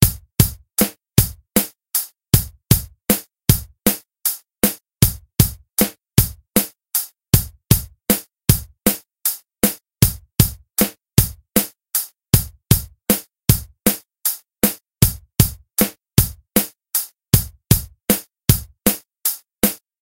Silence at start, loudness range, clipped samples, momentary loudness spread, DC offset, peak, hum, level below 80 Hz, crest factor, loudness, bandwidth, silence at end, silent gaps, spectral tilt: 0 s; 1 LU; under 0.1%; 4 LU; under 0.1%; 0 dBFS; none; -32 dBFS; 20 dB; -19 LUFS; over 20 kHz; 0.3 s; none; -4.5 dB/octave